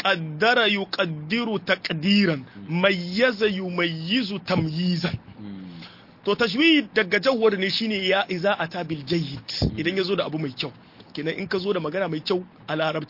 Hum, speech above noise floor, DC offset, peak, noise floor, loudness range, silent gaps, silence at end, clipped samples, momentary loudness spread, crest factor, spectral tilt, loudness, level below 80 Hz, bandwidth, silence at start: none; 21 dB; under 0.1%; -4 dBFS; -44 dBFS; 5 LU; none; 0.05 s; under 0.1%; 11 LU; 20 dB; -6 dB/octave; -23 LUFS; -50 dBFS; 5.8 kHz; 0 s